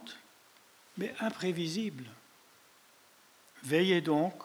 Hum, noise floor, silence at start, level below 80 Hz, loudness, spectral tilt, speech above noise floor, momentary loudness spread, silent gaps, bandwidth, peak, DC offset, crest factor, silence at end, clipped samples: none; -62 dBFS; 0 s; -86 dBFS; -32 LUFS; -5.5 dB/octave; 30 dB; 22 LU; none; over 20 kHz; -16 dBFS; under 0.1%; 20 dB; 0 s; under 0.1%